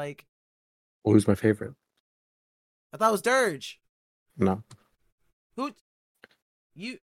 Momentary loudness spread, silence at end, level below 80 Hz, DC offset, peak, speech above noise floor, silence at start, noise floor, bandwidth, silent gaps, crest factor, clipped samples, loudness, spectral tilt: 18 LU; 0.1 s; -64 dBFS; under 0.1%; -6 dBFS; over 64 dB; 0 s; under -90 dBFS; 16 kHz; 0.28-1.02 s, 2.00-2.90 s, 3.89-4.26 s, 5.12-5.18 s, 5.33-5.50 s, 5.81-6.15 s, 6.42-6.70 s; 22 dB; under 0.1%; -26 LUFS; -6 dB/octave